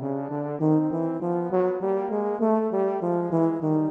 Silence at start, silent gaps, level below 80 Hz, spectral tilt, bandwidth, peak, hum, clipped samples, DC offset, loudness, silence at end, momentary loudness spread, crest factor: 0 s; none; -72 dBFS; -11 dB/octave; 3.4 kHz; -10 dBFS; none; under 0.1%; under 0.1%; -25 LUFS; 0 s; 4 LU; 14 dB